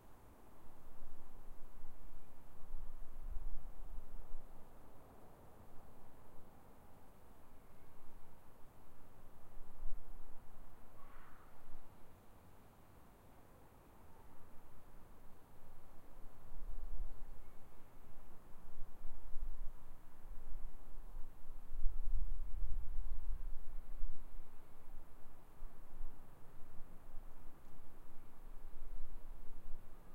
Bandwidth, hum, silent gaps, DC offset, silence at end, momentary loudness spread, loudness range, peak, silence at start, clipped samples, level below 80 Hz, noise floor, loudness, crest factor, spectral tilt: 2 kHz; none; none; under 0.1%; 0 s; 14 LU; 13 LU; -18 dBFS; 0.05 s; under 0.1%; -46 dBFS; -61 dBFS; -58 LUFS; 18 dB; -6.5 dB/octave